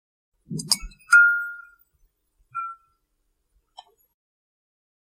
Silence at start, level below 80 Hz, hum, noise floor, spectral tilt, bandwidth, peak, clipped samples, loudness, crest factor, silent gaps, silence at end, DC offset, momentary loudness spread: 0.5 s; -52 dBFS; none; -73 dBFS; -0.5 dB/octave; 16 kHz; -2 dBFS; under 0.1%; -19 LUFS; 26 dB; none; 2.3 s; under 0.1%; 21 LU